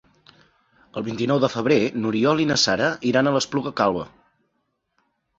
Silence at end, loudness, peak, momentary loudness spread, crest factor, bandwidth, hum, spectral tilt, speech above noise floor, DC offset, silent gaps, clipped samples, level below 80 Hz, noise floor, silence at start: 1.3 s; -21 LUFS; -4 dBFS; 12 LU; 20 dB; 8 kHz; none; -4.5 dB/octave; 52 dB; under 0.1%; none; under 0.1%; -58 dBFS; -73 dBFS; 0.95 s